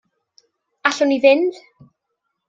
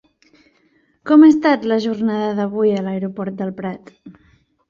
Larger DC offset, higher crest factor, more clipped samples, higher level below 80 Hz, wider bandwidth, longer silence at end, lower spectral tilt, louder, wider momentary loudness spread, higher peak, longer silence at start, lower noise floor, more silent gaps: neither; about the same, 18 dB vs 16 dB; neither; second, -72 dBFS vs -62 dBFS; about the same, 7.8 kHz vs 7.2 kHz; first, 0.95 s vs 0.6 s; second, -3 dB/octave vs -7.5 dB/octave; about the same, -17 LUFS vs -16 LUFS; second, 8 LU vs 18 LU; about the same, -2 dBFS vs -2 dBFS; second, 0.85 s vs 1.05 s; first, -76 dBFS vs -59 dBFS; neither